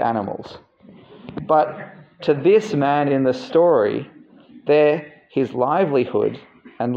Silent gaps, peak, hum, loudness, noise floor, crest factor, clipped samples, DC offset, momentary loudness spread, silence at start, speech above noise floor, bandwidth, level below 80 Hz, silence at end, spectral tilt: none; -4 dBFS; none; -19 LUFS; -46 dBFS; 16 dB; under 0.1%; under 0.1%; 18 LU; 0 s; 28 dB; 8 kHz; -64 dBFS; 0 s; -7.5 dB/octave